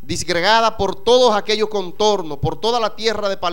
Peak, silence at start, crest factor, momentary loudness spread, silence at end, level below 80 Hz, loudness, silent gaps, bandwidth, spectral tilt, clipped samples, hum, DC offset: -2 dBFS; 0.1 s; 16 dB; 7 LU; 0 s; -44 dBFS; -17 LUFS; none; 17 kHz; -3.5 dB/octave; under 0.1%; none; 4%